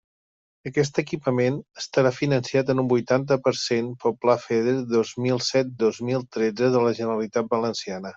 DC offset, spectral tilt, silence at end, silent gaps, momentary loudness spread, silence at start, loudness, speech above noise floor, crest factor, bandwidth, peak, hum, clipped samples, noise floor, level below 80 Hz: under 0.1%; -5.5 dB/octave; 0.05 s; none; 5 LU; 0.65 s; -24 LUFS; over 67 dB; 18 dB; 8 kHz; -4 dBFS; none; under 0.1%; under -90 dBFS; -64 dBFS